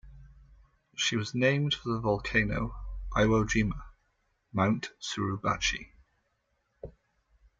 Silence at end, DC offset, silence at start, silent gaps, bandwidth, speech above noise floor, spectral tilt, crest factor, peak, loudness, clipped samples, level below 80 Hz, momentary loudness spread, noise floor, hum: 0.7 s; under 0.1%; 0.05 s; none; 8.8 kHz; 47 dB; -5 dB/octave; 20 dB; -12 dBFS; -29 LUFS; under 0.1%; -46 dBFS; 17 LU; -76 dBFS; none